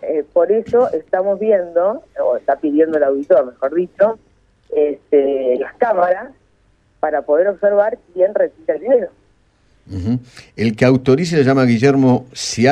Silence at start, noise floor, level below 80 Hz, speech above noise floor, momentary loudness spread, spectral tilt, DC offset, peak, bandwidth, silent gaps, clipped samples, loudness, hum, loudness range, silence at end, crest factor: 0 s; -56 dBFS; -52 dBFS; 41 dB; 9 LU; -6.5 dB/octave; under 0.1%; 0 dBFS; 10.5 kHz; none; under 0.1%; -16 LUFS; none; 3 LU; 0 s; 16 dB